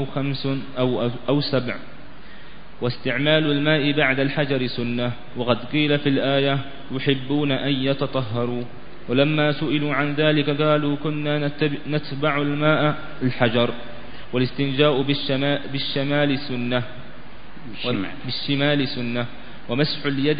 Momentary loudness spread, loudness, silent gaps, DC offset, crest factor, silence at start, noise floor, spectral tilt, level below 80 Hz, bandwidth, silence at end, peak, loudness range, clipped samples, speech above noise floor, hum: 9 LU; -22 LUFS; none; 3%; 20 dB; 0 s; -43 dBFS; -11 dB/octave; -50 dBFS; 5.2 kHz; 0 s; -2 dBFS; 4 LU; under 0.1%; 21 dB; none